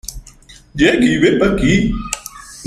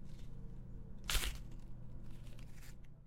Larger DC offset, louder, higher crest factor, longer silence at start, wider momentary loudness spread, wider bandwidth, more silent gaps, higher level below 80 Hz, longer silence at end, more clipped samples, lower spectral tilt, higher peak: neither; first, -14 LUFS vs -46 LUFS; second, 16 dB vs 24 dB; about the same, 0.05 s vs 0 s; first, 19 LU vs 16 LU; about the same, 15 kHz vs 16 kHz; neither; first, -30 dBFS vs -48 dBFS; about the same, 0 s vs 0 s; neither; first, -5 dB/octave vs -2.5 dB/octave; first, 0 dBFS vs -20 dBFS